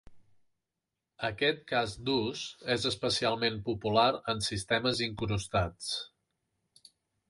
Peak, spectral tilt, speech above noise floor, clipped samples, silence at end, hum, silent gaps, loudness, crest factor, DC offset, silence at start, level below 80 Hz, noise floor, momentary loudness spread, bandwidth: -12 dBFS; -4 dB/octave; 57 dB; under 0.1%; 1.25 s; none; none; -31 LUFS; 20 dB; under 0.1%; 0.1 s; -54 dBFS; -88 dBFS; 9 LU; 11.5 kHz